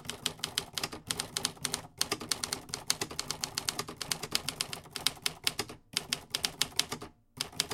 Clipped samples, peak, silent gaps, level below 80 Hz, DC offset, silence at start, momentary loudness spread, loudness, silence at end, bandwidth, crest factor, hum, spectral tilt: under 0.1%; -6 dBFS; none; -60 dBFS; under 0.1%; 0 s; 6 LU; -34 LUFS; 0 s; 17 kHz; 32 dB; none; -1 dB/octave